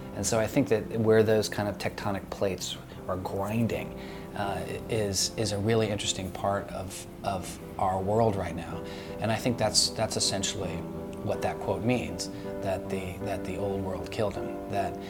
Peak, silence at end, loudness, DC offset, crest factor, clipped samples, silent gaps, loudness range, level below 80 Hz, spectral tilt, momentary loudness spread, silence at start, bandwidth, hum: -8 dBFS; 0 s; -30 LUFS; under 0.1%; 22 dB; under 0.1%; none; 4 LU; -52 dBFS; -4.5 dB/octave; 11 LU; 0 s; 19 kHz; none